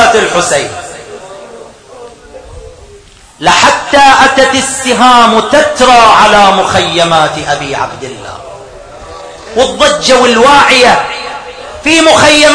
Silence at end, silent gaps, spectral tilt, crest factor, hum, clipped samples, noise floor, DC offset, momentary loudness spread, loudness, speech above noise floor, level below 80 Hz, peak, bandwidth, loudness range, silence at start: 0 s; none; -2.5 dB/octave; 8 dB; none; 4%; -36 dBFS; under 0.1%; 22 LU; -6 LUFS; 30 dB; -36 dBFS; 0 dBFS; 11 kHz; 8 LU; 0 s